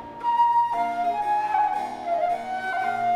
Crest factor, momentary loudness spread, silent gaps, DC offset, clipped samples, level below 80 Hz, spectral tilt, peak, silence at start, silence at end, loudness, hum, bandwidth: 12 dB; 7 LU; none; under 0.1%; under 0.1%; -62 dBFS; -4 dB/octave; -12 dBFS; 0 s; 0 s; -24 LUFS; none; 13 kHz